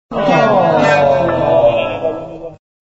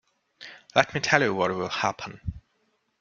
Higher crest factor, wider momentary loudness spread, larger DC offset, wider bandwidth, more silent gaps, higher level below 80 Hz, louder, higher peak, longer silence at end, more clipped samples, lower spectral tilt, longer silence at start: second, 12 dB vs 26 dB; second, 17 LU vs 22 LU; neither; about the same, 7.8 kHz vs 7.6 kHz; neither; first, -42 dBFS vs -52 dBFS; first, -12 LUFS vs -25 LUFS; about the same, 0 dBFS vs -2 dBFS; second, 0.45 s vs 0.6 s; neither; about the same, -4.5 dB/octave vs -4 dB/octave; second, 0.1 s vs 0.4 s